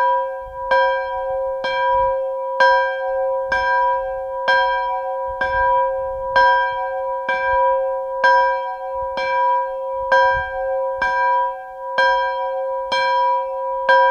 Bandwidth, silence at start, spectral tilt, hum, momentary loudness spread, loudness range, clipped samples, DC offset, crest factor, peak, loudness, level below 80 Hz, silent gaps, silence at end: 6.8 kHz; 0 s; -3 dB/octave; none; 9 LU; 1 LU; under 0.1%; under 0.1%; 16 dB; -4 dBFS; -19 LUFS; -46 dBFS; none; 0 s